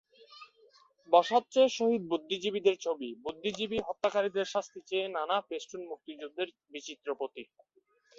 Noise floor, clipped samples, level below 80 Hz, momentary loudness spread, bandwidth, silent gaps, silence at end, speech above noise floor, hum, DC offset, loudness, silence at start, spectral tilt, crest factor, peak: -64 dBFS; under 0.1%; -72 dBFS; 17 LU; 7.8 kHz; none; 0.75 s; 32 dB; none; under 0.1%; -31 LUFS; 0.3 s; -3.5 dB/octave; 24 dB; -10 dBFS